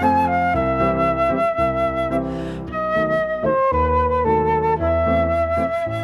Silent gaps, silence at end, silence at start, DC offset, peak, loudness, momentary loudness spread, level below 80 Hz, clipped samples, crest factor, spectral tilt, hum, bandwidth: none; 0 s; 0 s; under 0.1%; -6 dBFS; -19 LUFS; 4 LU; -34 dBFS; under 0.1%; 14 dB; -8 dB/octave; none; 12 kHz